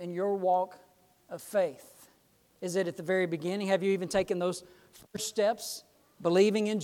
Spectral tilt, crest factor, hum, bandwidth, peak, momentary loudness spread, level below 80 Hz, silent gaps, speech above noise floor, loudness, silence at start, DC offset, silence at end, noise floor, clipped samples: -5 dB/octave; 20 dB; none; 17 kHz; -12 dBFS; 16 LU; -68 dBFS; none; 36 dB; -30 LUFS; 0 s; under 0.1%; 0 s; -66 dBFS; under 0.1%